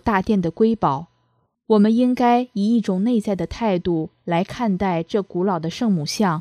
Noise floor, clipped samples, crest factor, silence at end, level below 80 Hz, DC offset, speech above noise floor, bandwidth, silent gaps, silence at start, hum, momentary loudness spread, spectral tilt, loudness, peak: -66 dBFS; under 0.1%; 14 dB; 0 s; -48 dBFS; under 0.1%; 47 dB; 13.5 kHz; none; 0.05 s; none; 7 LU; -6.5 dB/octave; -20 LUFS; -6 dBFS